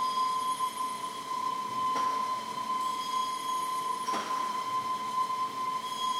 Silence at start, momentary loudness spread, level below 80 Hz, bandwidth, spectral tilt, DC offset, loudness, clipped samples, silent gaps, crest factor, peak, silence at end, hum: 0 s; 4 LU; -78 dBFS; 16 kHz; -1.5 dB/octave; under 0.1%; -32 LUFS; under 0.1%; none; 12 dB; -20 dBFS; 0 s; none